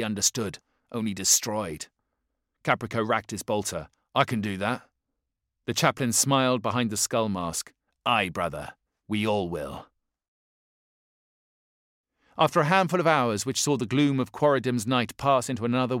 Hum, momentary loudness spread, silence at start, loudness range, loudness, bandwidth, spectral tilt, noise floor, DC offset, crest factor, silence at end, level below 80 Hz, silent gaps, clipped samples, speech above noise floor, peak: none; 13 LU; 0 s; 8 LU; -26 LUFS; 16.5 kHz; -3.5 dB/octave; -82 dBFS; under 0.1%; 24 dB; 0 s; -60 dBFS; 10.28-12.04 s; under 0.1%; 57 dB; -4 dBFS